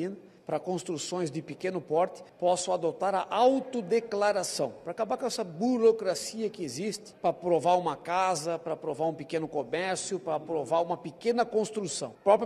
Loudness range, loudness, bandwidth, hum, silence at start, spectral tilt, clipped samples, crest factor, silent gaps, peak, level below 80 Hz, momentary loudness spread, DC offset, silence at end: 3 LU; -30 LUFS; 13.5 kHz; none; 0 s; -4.5 dB/octave; under 0.1%; 20 dB; none; -10 dBFS; -72 dBFS; 10 LU; under 0.1%; 0 s